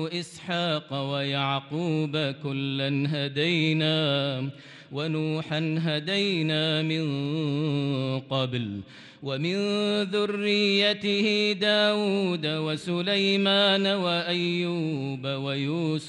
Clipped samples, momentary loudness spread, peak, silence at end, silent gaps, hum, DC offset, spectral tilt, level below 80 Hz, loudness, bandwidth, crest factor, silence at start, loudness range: under 0.1%; 9 LU; -12 dBFS; 0 s; none; none; under 0.1%; -6 dB/octave; -72 dBFS; -26 LUFS; 11 kHz; 16 dB; 0 s; 4 LU